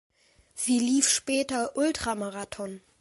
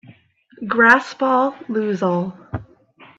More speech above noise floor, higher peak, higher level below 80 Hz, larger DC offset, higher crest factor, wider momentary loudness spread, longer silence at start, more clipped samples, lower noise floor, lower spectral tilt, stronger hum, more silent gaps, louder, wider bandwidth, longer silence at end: second, 22 dB vs 34 dB; second, -8 dBFS vs 0 dBFS; about the same, -58 dBFS vs -56 dBFS; neither; about the same, 20 dB vs 20 dB; second, 15 LU vs 20 LU; about the same, 0.55 s vs 0.6 s; neither; about the same, -50 dBFS vs -51 dBFS; second, -2 dB/octave vs -6.5 dB/octave; neither; neither; second, -27 LUFS vs -17 LUFS; first, 12 kHz vs 10.5 kHz; second, 0.2 s vs 0.55 s